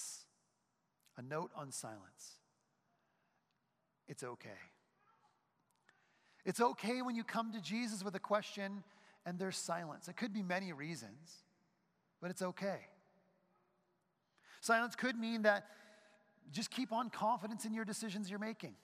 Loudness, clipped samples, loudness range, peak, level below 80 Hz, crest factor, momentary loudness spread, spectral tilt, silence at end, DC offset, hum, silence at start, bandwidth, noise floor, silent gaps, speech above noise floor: -41 LUFS; under 0.1%; 16 LU; -18 dBFS; under -90 dBFS; 26 dB; 20 LU; -4 dB/octave; 0.1 s; under 0.1%; none; 0 s; 15.5 kHz; -84 dBFS; none; 43 dB